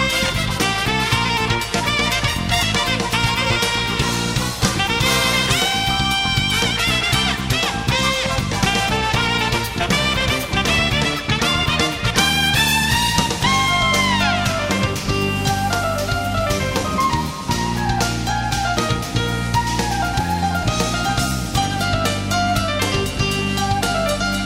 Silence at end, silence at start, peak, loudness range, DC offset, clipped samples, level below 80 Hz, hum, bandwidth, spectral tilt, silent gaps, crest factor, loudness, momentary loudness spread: 0 s; 0 s; 0 dBFS; 4 LU; under 0.1%; under 0.1%; -32 dBFS; none; 16.5 kHz; -3.5 dB/octave; none; 18 dB; -18 LUFS; 5 LU